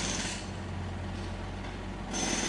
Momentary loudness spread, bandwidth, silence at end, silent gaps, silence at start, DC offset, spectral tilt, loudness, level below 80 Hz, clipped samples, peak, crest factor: 8 LU; 11.5 kHz; 0 s; none; 0 s; under 0.1%; -3 dB/octave; -36 LUFS; -44 dBFS; under 0.1%; -18 dBFS; 18 dB